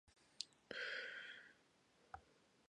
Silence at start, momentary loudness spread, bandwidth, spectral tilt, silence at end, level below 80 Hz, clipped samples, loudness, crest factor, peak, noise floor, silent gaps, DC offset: 0.05 s; 15 LU; 10.5 kHz; -1 dB/octave; 0.1 s; -82 dBFS; under 0.1%; -50 LUFS; 30 dB; -24 dBFS; -75 dBFS; none; under 0.1%